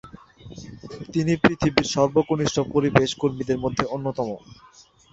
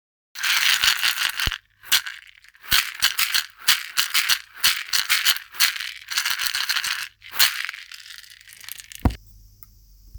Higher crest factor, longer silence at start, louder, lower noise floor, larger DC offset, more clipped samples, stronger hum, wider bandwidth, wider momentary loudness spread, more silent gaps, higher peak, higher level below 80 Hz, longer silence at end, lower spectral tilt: about the same, 22 dB vs 24 dB; second, 0.05 s vs 0.35 s; about the same, -22 LUFS vs -20 LUFS; second, -44 dBFS vs -50 dBFS; neither; neither; neither; second, 8 kHz vs over 20 kHz; about the same, 19 LU vs 19 LU; neither; about the same, -2 dBFS vs 0 dBFS; second, -48 dBFS vs -42 dBFS; first, 0.6 s vs 0 s; first, -5.5 dB/octave vs 0 dB/octave